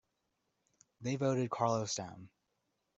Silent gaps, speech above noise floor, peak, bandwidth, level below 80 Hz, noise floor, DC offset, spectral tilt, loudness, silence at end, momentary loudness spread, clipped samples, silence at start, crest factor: none; 48 dB; -18 dBFS; 8.2 kHz; -76 dBFS; -83 dBFS; under 0.1%; -5 dB/octave; -36 LUFS; 0.7 s; 13 LU; under 0.1%; 1 s; 22 dB